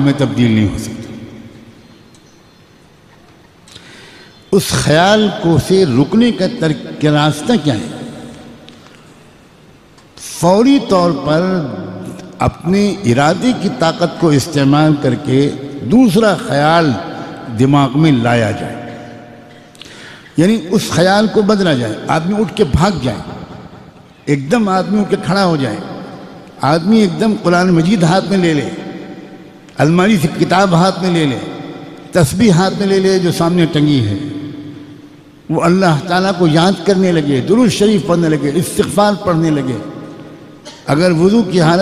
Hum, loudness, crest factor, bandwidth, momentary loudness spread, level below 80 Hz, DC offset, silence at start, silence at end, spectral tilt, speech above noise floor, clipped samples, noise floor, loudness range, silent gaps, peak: none; -13 LUFS; 14 dB; 15 kHz; 18 LU; -40 dBFS; under 0.1%; 0 s; 0 s; -6 dB/octave; 32 dB; under 0.1%; -44 dBFS; 4 LU; none; 0 dBFS